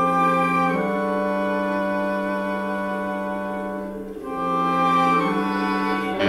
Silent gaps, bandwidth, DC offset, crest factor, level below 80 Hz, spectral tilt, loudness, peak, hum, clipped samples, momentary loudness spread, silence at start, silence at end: none; 15 kHz; under 0.1%; 14 dB; -52 dBFS; -6.5 dB/octave; -22 LUFS; -8 dBFS; none; under 0.1%; 9 LU; 0 s; 0 s